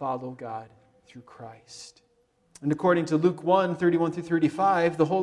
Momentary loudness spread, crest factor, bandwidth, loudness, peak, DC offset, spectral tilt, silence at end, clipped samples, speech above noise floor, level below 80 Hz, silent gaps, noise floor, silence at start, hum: 21 LU; 18 dB; 11 kHz; -25 LUFS; -8 dBFS; under 0.1%; -7 dB/octave; 0 s; under 0.1%; 42 dB; -68 dBFS; none; -67 dBFS; 0 s; none